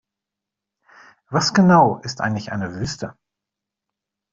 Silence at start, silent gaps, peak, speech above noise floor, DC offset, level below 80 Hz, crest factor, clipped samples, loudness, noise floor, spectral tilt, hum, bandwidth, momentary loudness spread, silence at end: 1.3 s; none; -2 dBFS; 67 dB; under 0.1%; -54 dBFS; 20 dB; under 0.1%; -19 LUFS; -85 dBFS; -5.5 dB/octave; none; 7.6 kHz; 14 LU; 1.2 s